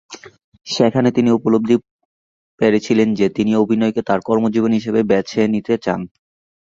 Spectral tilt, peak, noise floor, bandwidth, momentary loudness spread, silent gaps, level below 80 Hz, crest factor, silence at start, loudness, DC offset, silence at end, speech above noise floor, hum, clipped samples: -6.5 dB/octave; -2 dBFS; under -90 dBFS; 7.6 kHz; 7 LU; 0.44-0.52 s, 1.91-1.99 s, 2.05-2.58 s; -54 dBFS; 16 dB; 0.1 s; -17 LUFS; under 0.1%; 0.6 s; over 74 dB; none; under 0.1%